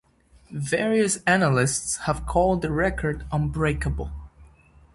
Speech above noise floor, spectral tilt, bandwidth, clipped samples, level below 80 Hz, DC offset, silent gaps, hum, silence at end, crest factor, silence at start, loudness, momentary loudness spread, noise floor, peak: 30 dB; -5 dB/octave; 11.5 kHz; under 0.1%; -38 dBFS; under 0.1%; none; none; 0.5 s; 20 dB; 0.5 s; -24 LUFS; 13 LU; -53 dBFS; -4 dBFS